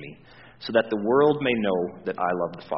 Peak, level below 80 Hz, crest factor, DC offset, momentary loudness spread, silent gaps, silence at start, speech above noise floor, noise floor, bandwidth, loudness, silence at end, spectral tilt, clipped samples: -6 dBFS; -62 dBFS; 18 dB; 0.1%; 10 LU; none; 0 s; 25 dB; -49 dBFS; 5.8 kHz; -24 LUFS; 0 s; -4 dB/octave; under 0.1%